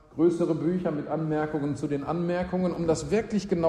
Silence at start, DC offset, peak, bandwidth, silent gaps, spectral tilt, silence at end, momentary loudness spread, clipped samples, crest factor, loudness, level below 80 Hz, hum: 0.15 s; under 0.1%; -12 dBFS; 11 kHz; none; -7 dB/octave; 0 s; 5 LU; under 0.1%; 16 dB; -28 LUFS; -52 dBFS; none